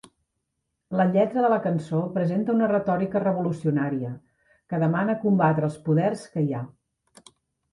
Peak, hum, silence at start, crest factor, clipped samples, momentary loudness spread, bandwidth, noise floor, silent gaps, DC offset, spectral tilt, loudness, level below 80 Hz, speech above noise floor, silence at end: -8 dBFS; none; 0.9 s; 16 dB; under 0.1%; 9 LU; 11.5 kHz; -79 dBFS; none; under 0.1%; -9 dB/octave; -24 LUFS; -64 dBFS; 56 dB; 1.05 s